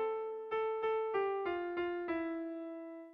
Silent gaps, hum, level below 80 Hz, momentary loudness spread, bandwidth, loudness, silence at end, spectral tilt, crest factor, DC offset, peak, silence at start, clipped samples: none; none; -74 dBFS; 9 LU; 5.4 kHz; -38 LUFS; 0 s; -2.5 dB/octave; 12 dB; under 0.1%; -26 dBFS; 0 s; under 0.1%